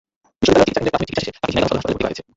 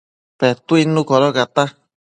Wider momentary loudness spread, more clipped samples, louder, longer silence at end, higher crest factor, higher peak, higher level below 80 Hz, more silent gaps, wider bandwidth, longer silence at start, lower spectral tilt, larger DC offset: first, 9 LU vs 5 LU; neither; about the same, -18 LUFS vs -16 LUFS; second, 0.15 s vs 0.5 s; about the same, 18 dB vs 16 dB; about the same, -2 dBFS vs 0 dBFS; first, -40 dBFS vs -62 dBFS; neither; second, 8 kHz vs 10 kHz; about the same, 0.4 s vs 0.4 s; about the same, -5 dB/octave vs -6 dB/octave; neither